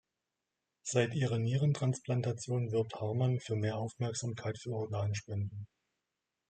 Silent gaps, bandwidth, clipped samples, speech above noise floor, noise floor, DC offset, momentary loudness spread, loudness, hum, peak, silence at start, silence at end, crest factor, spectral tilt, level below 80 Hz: none; 9.2 kHz; under 0.1%; 54 dB; -88 dBFS; under 0.1%; 8 LU; -35 LUFS; none; -16 dBFS; 0.85 s; 0.85 s; 20 dB; -6 dB/octave; -72 dBFS